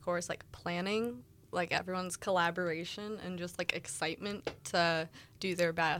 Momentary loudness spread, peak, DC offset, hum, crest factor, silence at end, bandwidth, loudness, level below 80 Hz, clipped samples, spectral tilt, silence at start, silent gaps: 10 LU; -12 dBFS; under 0.1%; none; 22 dB; 0 s; 16.5 kHz; -35 LUFS; -68 dBFS; under 0.1%; -4 dB/octave; 0 s; none